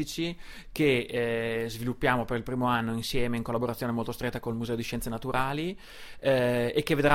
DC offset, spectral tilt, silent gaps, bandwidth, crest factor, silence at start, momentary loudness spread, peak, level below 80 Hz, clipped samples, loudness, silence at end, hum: under 0.1%; -5.5 dB/octave; none; 16.5 kHz; 20 dB; 0 s; 8 LU; -8 dBFS; -46 dBFS; under 0.1%; -29 LUFS; 0 s; none